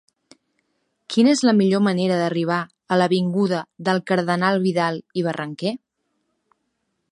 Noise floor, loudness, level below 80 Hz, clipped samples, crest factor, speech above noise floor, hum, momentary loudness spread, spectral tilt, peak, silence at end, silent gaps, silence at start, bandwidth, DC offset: -74 dBFS; -20 LUFS; -70 dBFS; under 0.1%; 18 dB; 54 dB; none; 9 LU; -6 dB/octave; -4 dBFS; 1.35 s; none; 1.1 s; 11.5 kHz; under 0.1%